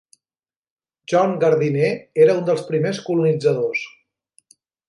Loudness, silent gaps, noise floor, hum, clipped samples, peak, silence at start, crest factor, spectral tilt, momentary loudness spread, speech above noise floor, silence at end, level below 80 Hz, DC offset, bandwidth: -19 LUFS; none; under -90 dBFS; none; under 0.1%; -4 dBFS; 1.1 s; 16 dB; -7 dB/octave; 6 LU; over 72 dB; 1 s; -72 dBFS; under 0.1%; 11.5 kHz